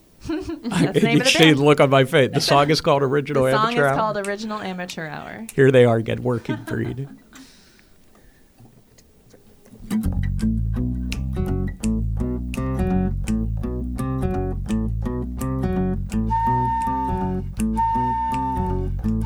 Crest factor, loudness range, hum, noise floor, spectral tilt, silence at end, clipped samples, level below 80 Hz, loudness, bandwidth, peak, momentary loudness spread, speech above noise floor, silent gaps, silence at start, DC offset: 20 dB; 13 LU; none; -52 dBFS; -5.5 dB/octave; 0 s; under 0.1%; -32 dBFS; -21 LUFS; over 20 kHz; 0 dBFS; 12 LU; 33 dB; none; 0.25 s; under 0.1%